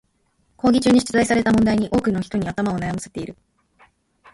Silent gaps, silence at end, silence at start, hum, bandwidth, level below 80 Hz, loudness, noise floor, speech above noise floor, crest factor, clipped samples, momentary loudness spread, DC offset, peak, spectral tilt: none; 1 s; 0.65 s; none; 11.5 kHz; -46 dBFS; -19 LUFS; -65 dBFS; 46 dB; 16 dB; under 0.1%; 13 LU; under 0.1%; -4 dBFS; -5.5 dB/octave